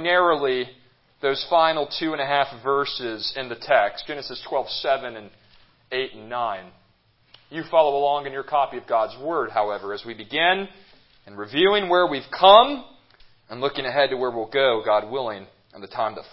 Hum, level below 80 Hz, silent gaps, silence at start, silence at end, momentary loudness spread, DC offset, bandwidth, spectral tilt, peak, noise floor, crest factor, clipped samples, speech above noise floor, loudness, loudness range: none; -62 dBFS; none; 0 s; 0.05 s; 13 LU; under 0.1%; 5.8 kHz; -8 dB/octave; 0 dBFS; -62 dBFS; 22 dB; under 0.1%; 39 dB; -22 LUFS; 7 LU